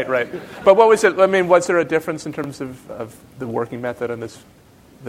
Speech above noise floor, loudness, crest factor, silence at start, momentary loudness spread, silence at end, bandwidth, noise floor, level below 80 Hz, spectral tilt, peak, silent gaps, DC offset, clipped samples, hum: 21 dB; -18 LUFS; 18 dB; 0 s; 20 LU; 0 s; 15.5 kHz; -39 dBFS; -58 dBFS; -5 dB/octave; 0 dBFS; none; under 0.1%; under 0.1%; none